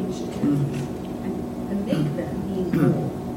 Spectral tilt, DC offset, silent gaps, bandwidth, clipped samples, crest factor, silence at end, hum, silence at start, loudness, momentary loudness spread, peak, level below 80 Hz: -8 dB/octave; under 0.1%; none; 16.5 kHz; under 0.1%; 16 dB; 0 s; none; 0 s; -25 LUFS; 8 LU; -8 dBFS; -46 dBFS